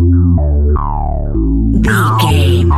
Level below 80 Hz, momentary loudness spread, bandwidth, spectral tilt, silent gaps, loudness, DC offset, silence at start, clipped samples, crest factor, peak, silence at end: -16 dBFS; 7 LU; 14 kHz; -7 dB/octave; none; -12 LUFS; under 0.1%; 0 s; under 0.1%; 10 dB; 0 dBFS; 0 s